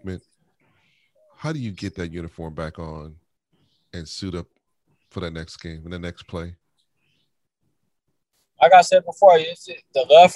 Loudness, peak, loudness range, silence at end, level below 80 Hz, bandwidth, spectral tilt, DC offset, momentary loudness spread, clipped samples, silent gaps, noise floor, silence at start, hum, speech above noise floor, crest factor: -18 LUFS; 0 dBFS; 18 LU; 0 s; -50 dBFS; 11.5 kHz; -4.5 dB/octave; under 0.1%; 23 LU; under 0.1%; none; -76 dBFS; 0.05 s; none; 57 dB; 22 dB